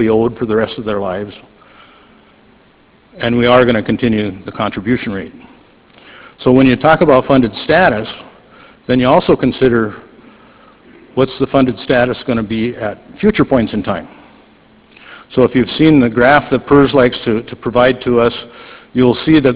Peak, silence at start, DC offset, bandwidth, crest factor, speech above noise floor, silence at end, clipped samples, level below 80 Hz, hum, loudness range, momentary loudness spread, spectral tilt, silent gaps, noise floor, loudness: 0 dBFS; 0 s; under 0.1%; 4 kHz; 14 dB; 36 dB; 0 s; 0.1%; -40 dBFS; none; 5 LU; 13 LU; -10.5 dB/octave; none; -48 dBFS; -13 LUFS